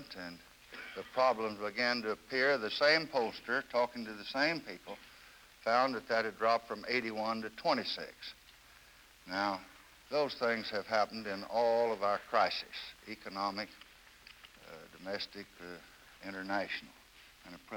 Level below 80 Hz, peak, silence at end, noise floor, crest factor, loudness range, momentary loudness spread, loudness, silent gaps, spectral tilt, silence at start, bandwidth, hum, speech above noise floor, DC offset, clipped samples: -70 dBFS; -16 dBFS; 0 s; -60 dBFS; 20 dB; 11 LU; 21 LU; -34 LUFS; none; -4 dB/octave; 0 s; 19.5 kHz; none; 25 dB; under 0.1%; under 0.1%